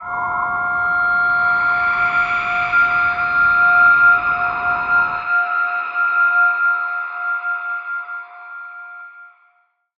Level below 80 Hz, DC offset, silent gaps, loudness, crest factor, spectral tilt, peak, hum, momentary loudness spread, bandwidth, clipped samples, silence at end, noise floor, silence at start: -52 dBFS; under 0.1%; none; -16 LUFS; 14 dB; -4.5 dB/octave; -4 dBFS; none; 18 LU; 6 kHz; under 0.1%; 0.7 s; -61 dBFS; 0 s